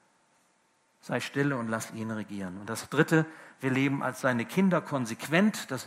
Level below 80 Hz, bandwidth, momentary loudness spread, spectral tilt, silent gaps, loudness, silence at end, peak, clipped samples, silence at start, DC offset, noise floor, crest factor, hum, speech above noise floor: -74 dBFS; 16 kHz; 11 LU; -5.5 dB/octave; none; -29 LUFS; 0 s; -8 dBFS; under 0.1%; 1.05 s; under 0.1%; -69 dBFS; 22 dB; none; 40 dB